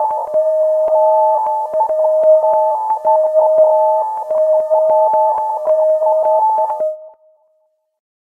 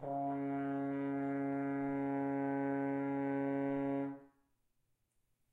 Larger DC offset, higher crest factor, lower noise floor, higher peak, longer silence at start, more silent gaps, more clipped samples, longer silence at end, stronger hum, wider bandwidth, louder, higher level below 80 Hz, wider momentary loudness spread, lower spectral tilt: neither; about the same, 12 dB vs 12 dB; second, -62 dBFS vs -80 dBFS; first, -2 dBFS vs -26 dBFS; about the same, 0 s vs 0 s; neither; neither; about the same, 1.15 s vs 1.25 s; neither; second, 2.1 kHz vs 3.8 kHz; first, -14 LUFS vs -38 LUFS; first, -66 dBFS vs -80 dBFS; first, 6 LU vs 2 LU; second, -5 dB/octave vs -10 dB/octave